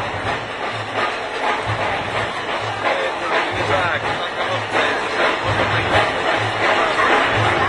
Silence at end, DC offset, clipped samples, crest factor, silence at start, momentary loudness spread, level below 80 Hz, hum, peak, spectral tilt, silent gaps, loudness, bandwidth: 0 s; under 0.1%; under 0.1%; 18 dB; 0 s; 7 LU; -46 dBFS; none; -2 dBFS; -4.5 dB/octave; none; -19 LUFS; 11 kHz